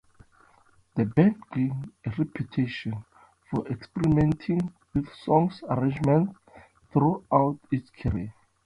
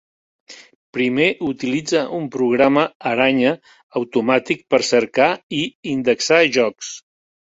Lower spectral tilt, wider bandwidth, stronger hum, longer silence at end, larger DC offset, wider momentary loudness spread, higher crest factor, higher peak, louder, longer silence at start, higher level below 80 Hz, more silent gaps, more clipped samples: first, -9.5 dB/octave vs -4 dB/octave; first, 10.5 kHz vs 8 kHz; neither; second, 0.35 s vs 0.55 s; neither; about the same, 11 LU vs 11 LU; about the same, 20 dB vs 18 dB; second, -6 dBFS vs -2 dBFS; second, -27 LUFS vs -18 LUFS; first, 0.95 s vs 0.5 s; first, -48 dBFS vs -60 dBFS; second, none vs 0.75-0.93 s, 2.95-3.00 s, 3.83-3.90 s, 5.43-5.49 s, 5.75-5.83 s; neither